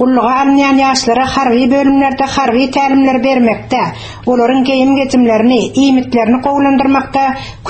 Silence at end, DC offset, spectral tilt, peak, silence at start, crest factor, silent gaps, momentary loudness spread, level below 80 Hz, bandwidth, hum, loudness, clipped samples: 0 s; under 0.1%; -5 dB/octave; 0 dBFS; 0 s; 10 dB; none; 5 LU; -40 dBFS; 8.8 kHz; none; -11 LUFS; under 0.1%